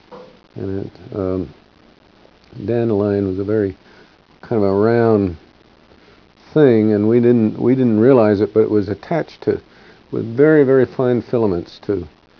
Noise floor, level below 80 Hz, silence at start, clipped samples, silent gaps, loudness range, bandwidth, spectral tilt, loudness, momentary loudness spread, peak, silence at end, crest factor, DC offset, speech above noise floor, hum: -49 dBFS; -52 dBFS; 0.1 s; under 0.1%; none; 7 LU; 5.4 kHz; -10 dB/octave; -16 LUFS; 14 LU; 0 dBFS; 0.3 s; 16 dB; under 0.1%; 34 dB; none